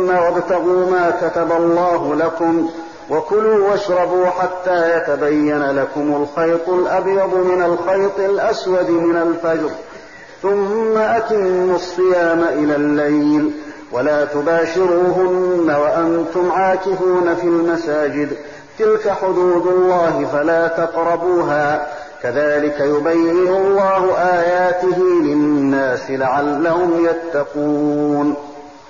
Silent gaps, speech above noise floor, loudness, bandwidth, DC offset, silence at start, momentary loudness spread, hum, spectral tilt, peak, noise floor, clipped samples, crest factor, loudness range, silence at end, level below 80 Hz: none; 22 dB; -16 LUFS; 7.4 kHz; 0.4%; 0 s; 5 LU; none; -5 dB/octave; -8 dBFS; -37 dBFS; under 0.1%; 8 dB; 2 LU; 0.15 s; -54 dBFS